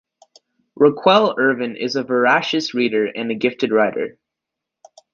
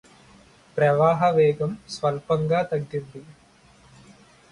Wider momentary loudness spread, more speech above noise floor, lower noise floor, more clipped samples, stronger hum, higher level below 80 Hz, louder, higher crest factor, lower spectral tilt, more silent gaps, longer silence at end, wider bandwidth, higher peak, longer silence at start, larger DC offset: second, 8 LU vs 15 LU; first, 66 dB vs 32 dB; first, -83 dBFS vs -54 dBFS; neither; neither; second, -64 dBFS vs -58 dBFS; first, -18 LUFS vs -23 LUFS; about the same, 18 dB vs 18 dB; second, -5 dB/octave vs -7 dB/octave; neither; second, 1.05 s vs 1.3 s; second, 7.2 kHz vs 11 kHz; first, -2 dBFS vs -6 dBFS; about the same, 0.8 s vs 0.75 s; neither